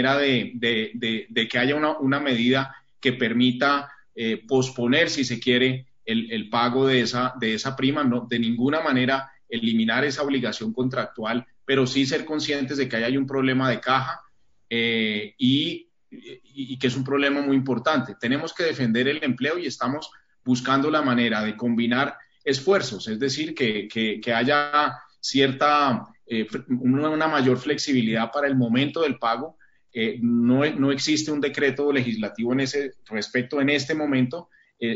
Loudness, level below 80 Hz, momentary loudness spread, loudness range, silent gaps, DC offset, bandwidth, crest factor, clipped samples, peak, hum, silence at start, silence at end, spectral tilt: -23 LUFS; -66 dBFS; 8 LU; 2 LU; none; 0.1%; 7.8 kHz; 18 dB; under 0.1%; -6 dBFS; none; 0 s; 0 s; -3.5 dB/octave